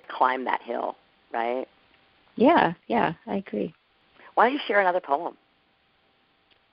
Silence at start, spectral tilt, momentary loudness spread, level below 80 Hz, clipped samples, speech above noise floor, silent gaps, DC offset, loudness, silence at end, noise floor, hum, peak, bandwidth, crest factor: 0.1 s; -3 dB/octave; 14 LU; -68 dBFS; under 0.1%; 42 dB; none; under 0.1%; -25 LUFS; 1.4 s; -66 dBFS; none; -6 dBFS; 5.6 kHz; 22 dB